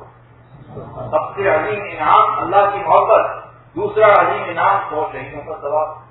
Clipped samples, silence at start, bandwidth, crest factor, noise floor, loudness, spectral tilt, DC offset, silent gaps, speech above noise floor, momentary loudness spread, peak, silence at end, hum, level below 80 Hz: under 0.1%; 0 s; 4.1 kHz; 16 dB; -44 dBFS; -16 LUFS; -9 dB/octave; under 0.1%; none; 28 dB; 17 LU; 0 dBFS; 0.1 s; none; -50 dBFS